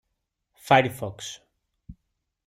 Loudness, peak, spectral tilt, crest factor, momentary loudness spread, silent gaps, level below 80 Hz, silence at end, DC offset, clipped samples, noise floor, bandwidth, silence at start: -23 LUFS; -4 dBFS; -4.5 dB/octave; 24 dB; 24 LU; none; -60 dBFS; 0.55 s; under 0.1%; under 0.1%; -79 dBFS; 16 kHz; 0.7 s